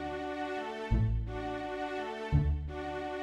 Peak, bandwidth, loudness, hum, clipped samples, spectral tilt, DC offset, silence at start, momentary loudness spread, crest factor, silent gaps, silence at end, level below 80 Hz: -16 dBFS; 9.2 kHz; -35 LUFS; none; under 0.1%; -7.5 dB/octave; under 0.1%; 0 s; 7 LU; 18 dB; none; 0 s; -38 dBFS